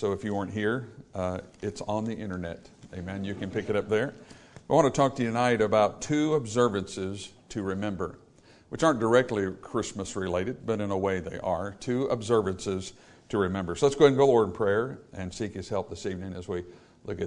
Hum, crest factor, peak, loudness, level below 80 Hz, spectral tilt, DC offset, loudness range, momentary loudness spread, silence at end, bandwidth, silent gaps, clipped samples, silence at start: none; 22 dB; -6 dBFS; -28 LUFS; -58 dBFS; -5.5 dB/octave; under 0.1%; 7 LU; 14 LU; 0 s; 10.5 kHz; none; under 0.1%; 0 s